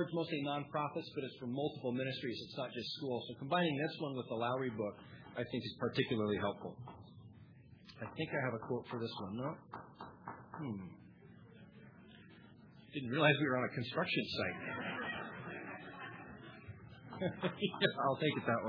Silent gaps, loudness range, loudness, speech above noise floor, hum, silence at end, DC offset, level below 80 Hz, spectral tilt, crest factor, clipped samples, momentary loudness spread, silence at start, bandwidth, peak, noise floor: none; 9 LU; -39 LUFS; 21 dB; none; 0 s; under 0.1%; -74 dBFS; -4 dB/octave; 26 dB; under 0.1%; 23 LU; 0 s; 5.4 kHz; -16 dBFS; -59 dBFS